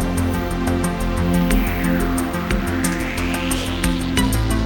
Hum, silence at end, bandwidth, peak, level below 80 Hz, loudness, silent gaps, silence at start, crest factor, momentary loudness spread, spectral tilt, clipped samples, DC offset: none; 0 s; 18 kHz; -4 dBFS; -26 dBFS; -20 LUFS; none; 0 s; 16 dB; 3 LU; -5 dB/octave; under 0.1%; under 0.1%